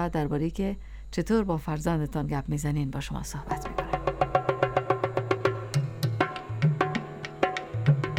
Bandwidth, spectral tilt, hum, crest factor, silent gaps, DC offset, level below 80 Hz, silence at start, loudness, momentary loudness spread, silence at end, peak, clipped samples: 16 kHz; -6.5 dB/octave; none; 20 dB; none; under 0.1%; -42 dBFS; 0 s; -29 LUFS; 8 LU; 0 s; -8 dBFS; under 0.1%